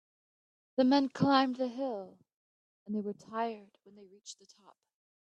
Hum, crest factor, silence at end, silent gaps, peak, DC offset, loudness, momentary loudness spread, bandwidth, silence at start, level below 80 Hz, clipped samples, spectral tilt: none; 22 dB; 1 s; 2.36-2.86 s; -12 dBFS; under 0.1%; -32 LUFS; 22 LU; 8.6 kHz; 0.8 s; -80 dBFS; under 0.1%; -6 dB/octave